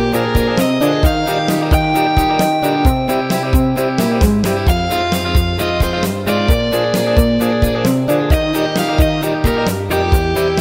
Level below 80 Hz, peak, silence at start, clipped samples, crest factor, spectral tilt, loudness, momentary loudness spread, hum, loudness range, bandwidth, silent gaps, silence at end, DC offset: -20 dBFS; 0 dBFS; 0 s; under 0.1%; 14 dB; -6 dB/octave; -15 LUFS; 3 LU; none; 1 LU; 16.5 kHz; none; 0 s; 0.1%